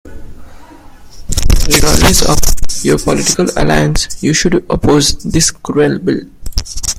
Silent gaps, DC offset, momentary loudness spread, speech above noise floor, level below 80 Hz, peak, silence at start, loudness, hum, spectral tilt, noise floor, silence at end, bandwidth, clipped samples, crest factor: none; under 0.1%; 9 LU; 24 dB; -18 dBFS; 0 dBFS; 0.05 s; -12 LUFS; none; -3.5 dB/octave; -34 dBFS; 0 s; 16 kHz; 0.3%; 10 dB